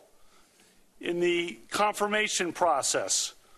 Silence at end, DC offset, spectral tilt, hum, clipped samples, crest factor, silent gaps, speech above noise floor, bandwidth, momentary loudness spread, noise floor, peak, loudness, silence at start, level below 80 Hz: 0.25 s; under 0.1%; -2 dB/octave; none; under 0.1%; 18 dB; none; 33 dB; 13 kHz; 6 LU; -61 dBFS; -12 dBFS; -27 LUFS; 1 s; -68 dBFS